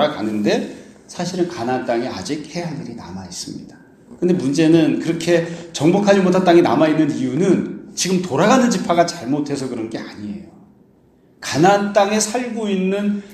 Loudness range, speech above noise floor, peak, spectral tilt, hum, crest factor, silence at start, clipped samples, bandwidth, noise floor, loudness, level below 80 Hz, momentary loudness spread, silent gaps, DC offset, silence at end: 8 LU; 35 dB; 0 dBFS; -5 dB/octave; none; 18 dB; 0 s; under 0.1%; 13.5 kHz; -53 dBFS; -18 LUFS; -58 dBFS; 16 LU; none; under 0.1%; 0 s